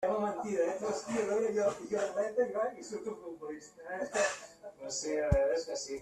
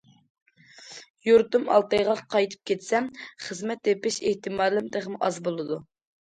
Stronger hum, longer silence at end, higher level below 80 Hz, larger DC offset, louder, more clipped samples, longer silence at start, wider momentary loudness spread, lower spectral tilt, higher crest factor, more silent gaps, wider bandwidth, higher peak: neither; second, 0 s vs 0.55 s; first, -50 dBFS vs -64 dBFS; neither; second, -34 LUFS vs -25 LUFS; neither; second, 0 s vs 0.8 s; about the same, 14 LU vs 15 LU; about the same, -4.5 dB/octave vs -4 dB/octave; about the same, 18 dB vs 20 dB; second, none vs 1.10-1.14 s; first, 13.5 kHz vs 9.4 kHz; second, -16 dBFS vs -6 dBFS